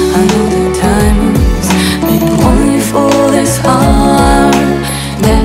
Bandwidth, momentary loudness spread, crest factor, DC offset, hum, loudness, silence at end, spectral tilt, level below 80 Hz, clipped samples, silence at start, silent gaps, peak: 16.5 kHz; 4 LU; 8 dB; under 0.1%; none; -9 LUFS; 0 s; -5.5 dB/octave; -18 dBFS; under 0.1%; 0 s; none; 0 dBFS